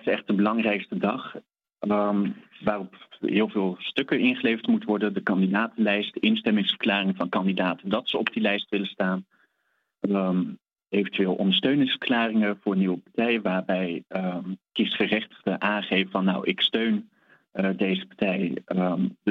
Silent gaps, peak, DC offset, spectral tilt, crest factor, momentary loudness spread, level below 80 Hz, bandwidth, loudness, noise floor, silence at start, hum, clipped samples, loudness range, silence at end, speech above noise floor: none; -6 dBFS; under 0.1%; -8 dB/octave; 20 dB; 7 LU; -70 dBFS; 4.9 kHz; -25 LUFS; -74 dBFS; 0.05 s; none; under 0.1%; 3 LU; 0 s; 49 dB